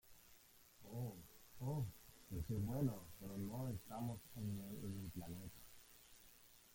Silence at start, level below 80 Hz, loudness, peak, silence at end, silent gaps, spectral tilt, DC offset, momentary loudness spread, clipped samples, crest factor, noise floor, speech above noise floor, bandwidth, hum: 0.05 s; -66 dBFS; -48 LUFS; -30 dBFS; 0 s; none; -7 dB/octave; under 0.1%; 20 LU; under 0.1%; 20 dB; -68 dBFS; 22 dB; 17 kHz; none